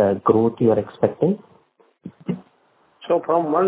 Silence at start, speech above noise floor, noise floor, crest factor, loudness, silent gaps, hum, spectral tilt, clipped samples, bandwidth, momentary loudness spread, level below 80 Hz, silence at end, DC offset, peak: 0 s; 41 dB; -60 dBFS; 18 dB; -21 LUFS; none; none; -12 dB/octave; under 0.1%; 4 kHz; 14 LU; -56 dBFS; 0 s; under 0.1%; -2 dBFS